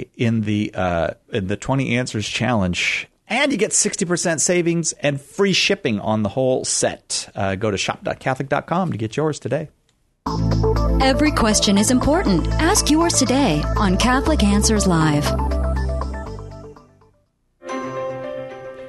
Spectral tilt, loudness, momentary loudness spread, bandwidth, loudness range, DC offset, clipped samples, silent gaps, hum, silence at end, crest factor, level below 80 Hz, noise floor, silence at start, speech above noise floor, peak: -4 dB/octave; -19 LUFS; 11 LU; 12.5 kHz; 6 LU; under 0.1%; under 0.1%; none; none; 0 s; 16 dB; -30 dBFS; -63 dBFS; 0 s; 45 dB; -2 dBFS